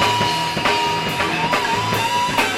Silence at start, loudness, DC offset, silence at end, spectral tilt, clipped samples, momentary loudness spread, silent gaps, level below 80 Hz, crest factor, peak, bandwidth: 0 s; -18 LUFS; under 0.1%; 0 s; -3 dB/octave; under 0.1%; 2 LU; none; -46 dBFS; 18 dB; -2 dBFS; 16.5 kHz